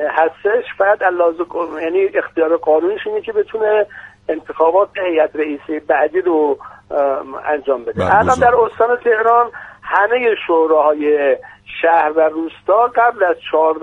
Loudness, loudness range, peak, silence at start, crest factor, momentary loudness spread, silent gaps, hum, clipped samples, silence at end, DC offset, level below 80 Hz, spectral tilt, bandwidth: -15 LUFS; 3 LU; 0 dBFS; 0 s; 16 dB; 9 LU; none; none; under 0.1%; 0 s; under 0.1%; -50 dBFS; -6 dB/octave; 9.6 kHz